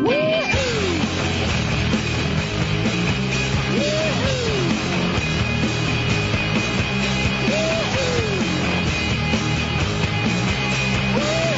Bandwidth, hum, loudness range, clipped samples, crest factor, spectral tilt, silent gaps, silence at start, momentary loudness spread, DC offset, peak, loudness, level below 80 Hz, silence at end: 8 kHz; none; 1 LU; under 0.1%; 14 dB; -5 dB/octave; none; 0 s; 2 LU; under 0.1%; -6 dBFS; -20 LUFS; -34 dBFS; 0 s